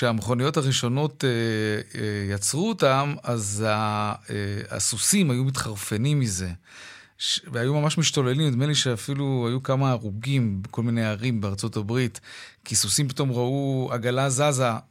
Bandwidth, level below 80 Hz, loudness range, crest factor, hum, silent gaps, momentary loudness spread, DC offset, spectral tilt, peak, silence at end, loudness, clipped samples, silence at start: 16 kHz; -58 dBFS; 2 LU; 18 dB; none; none; 8 LU; under 0.1%; -4.5 dB/octave; -6 dBFS; 0.1 s; -24 LUFS; under 0.1%; 0 s